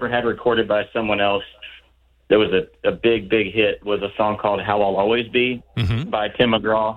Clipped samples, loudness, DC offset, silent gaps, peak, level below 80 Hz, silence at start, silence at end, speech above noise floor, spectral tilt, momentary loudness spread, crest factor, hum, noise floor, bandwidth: under 0.1%; -20 LUFS; under 0.1%; none; -4 dBFS; -46 dBFS; 0 s; 0 s; 37 dB; -7.5 dB/octave; 6 LU; 16 dB; none; -57 dBFS; 5.6 kHz